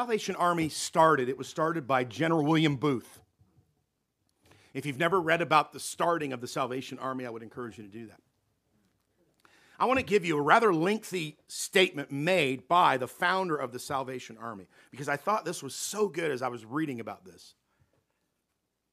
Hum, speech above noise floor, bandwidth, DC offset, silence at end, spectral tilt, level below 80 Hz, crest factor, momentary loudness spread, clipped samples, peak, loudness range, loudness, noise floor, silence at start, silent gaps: none; 52 dB; 15.5 kHz; under 0.1%; 1.45 s; -4.5 dB/octave; -72 dBFS; 24 dB; 16 LU; under 0.1%; -6 dBFS; 9 LU; -28 LUFS; -81 dBFS; 0 s; none